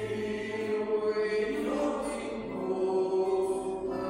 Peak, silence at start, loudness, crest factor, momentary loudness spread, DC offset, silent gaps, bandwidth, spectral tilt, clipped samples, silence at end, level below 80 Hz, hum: -18 dBFS; 0 s; -31 LUFS; 12 dB; 6 LU; under 0.1%; none; 12 kHz; -5.5 dB/octave; under 0.1%; 0 s; -58 dBFS; none